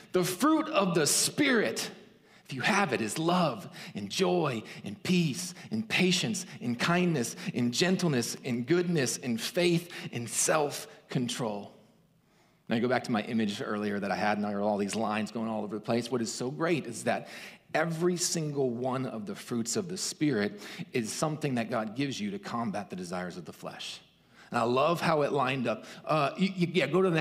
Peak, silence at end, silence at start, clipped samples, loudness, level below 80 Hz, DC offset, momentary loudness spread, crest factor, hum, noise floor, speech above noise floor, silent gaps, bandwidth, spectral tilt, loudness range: -10 dBFS; 0 s; 0 s; under 0.1%; -30 LUFS; -74 dBFS; under 0.1%; 11 LU; 20 dB; none; -65 dBFS; 35 dB; none; 16 kHz; -4.5 dB/octave; 4 LU